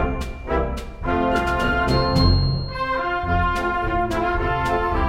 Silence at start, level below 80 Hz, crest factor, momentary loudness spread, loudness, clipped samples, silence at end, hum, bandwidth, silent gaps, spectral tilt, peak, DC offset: 0 s; -28 dBFS; 16 dB; 7 LU; -22 LUFS; under 0.1%; 0 s; none; 15.5 kHz; none; -6.5 dB/octave; -4 dBFS; under 0.1%